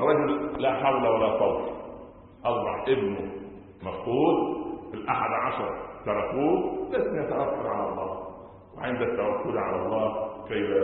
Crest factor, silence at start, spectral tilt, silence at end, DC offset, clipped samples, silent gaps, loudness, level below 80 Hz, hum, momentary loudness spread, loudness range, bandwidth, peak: 18 dB; 0 s; -10.5 dB/octave; 0 s; under 0.1%; under 0.1%; none; -28 LUFS; -54 dBFS; none; 14 LU; 2 LU; 4.2 kHz; -8 dBFS